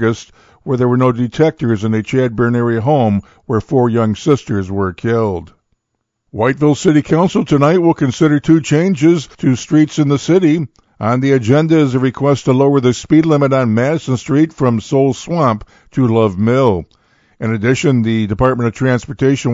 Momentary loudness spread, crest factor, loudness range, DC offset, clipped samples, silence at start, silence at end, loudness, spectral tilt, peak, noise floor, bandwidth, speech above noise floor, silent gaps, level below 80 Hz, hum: 7 LU; 14 dB; 3 LU; under 0.1%; under 0.1%; 0 s; 0 s; -14 LUFS; -7 dB/octave; 0 dBFS; -72 dBFS; 7.8 kHz; 59 dB; none; -44 dBFS; none